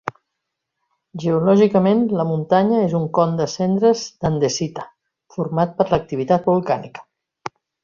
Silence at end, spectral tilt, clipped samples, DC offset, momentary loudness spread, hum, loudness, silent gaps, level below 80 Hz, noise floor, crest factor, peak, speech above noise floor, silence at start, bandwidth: 0.35 s; -6.5 dB/octave; under 0.1%; under 0.1%; 20 LU; none; -19 LUFS; none; -52 dBFS; -79 dBFS; 18 dB; -2 dBFS; 61 dB; 0.05 s; 7.4 kHz